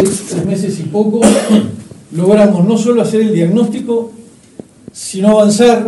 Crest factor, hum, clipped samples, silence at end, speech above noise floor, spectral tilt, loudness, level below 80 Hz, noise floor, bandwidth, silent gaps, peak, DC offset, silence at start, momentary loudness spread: 12 dB; none; 0.3%; 0 s; 25 dB; -6 dB/octave; -11 LUFS; -48 dBFS; -36 dBFS; 12 kHz; none; 0 dBFS; under 0.1%; 0 s; 14 LU